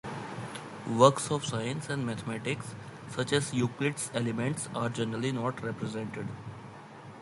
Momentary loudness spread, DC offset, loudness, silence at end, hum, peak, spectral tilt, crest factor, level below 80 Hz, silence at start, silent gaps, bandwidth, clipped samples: 17 LU; under 0.1%; -31 LUFS; 0 s; none; -6 dBFS; -5 dB/octave; 26 dB; -66 dBFS; 0.05 s; none; 11.5 kHz; under 0.1%